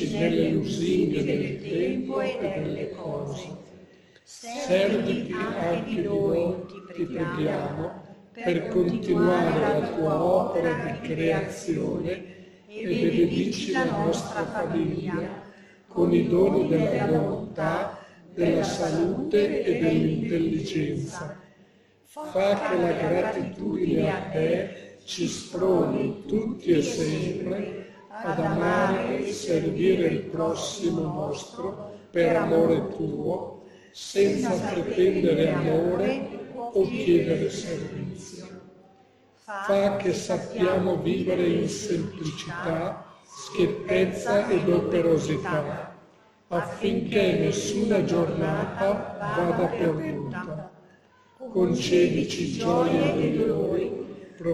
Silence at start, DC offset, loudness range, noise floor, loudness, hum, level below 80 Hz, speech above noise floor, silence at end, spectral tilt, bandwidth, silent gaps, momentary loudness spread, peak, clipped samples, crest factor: 0 s; under 0.1%; 3 LU; -58 dBFS; -26 LUFS; none; -56 dBFS; 33 dB; 0 s; -6 dB/octave; 12.5 kHz; none; 13 LU; -10 dBFS; under 0.1%; 16 dB